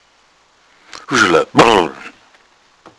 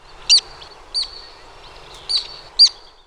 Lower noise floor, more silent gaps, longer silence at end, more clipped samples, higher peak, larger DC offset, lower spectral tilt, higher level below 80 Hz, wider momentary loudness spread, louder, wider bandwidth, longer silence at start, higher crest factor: first, -53 dBFS vs -41 dBFS; neither; first, 0.9 s vs 0.35 s; first, 0.2% vs under 0.1%; about the same, 0 dBFS vs -2 dBFS; neither; first, -4 dB/octave vs 2 dB/octave; about the same, -48 dBFS vs -48 dBFS; first, 22 LU vs 17 LU; first, -12 LUFS vs -15 LUFS; about the same, 11 kHz vs 11.5 kHz; first, 1.1 s vs 0.3 s; about the same, 16 dB vs 18 dB